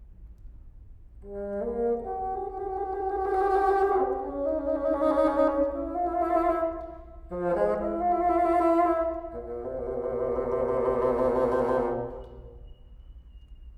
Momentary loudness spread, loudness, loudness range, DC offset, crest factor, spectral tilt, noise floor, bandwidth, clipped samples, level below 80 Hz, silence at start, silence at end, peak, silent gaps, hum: 13 LU; -27 LUFS; 3 LU; under 0.1%; 16 dB; -8.5 dB/octave; -47 dBFS; 11.5 kHz; under 0.1%; -46 dBFS; 0 s; 0 s; -12 dBFS; none; none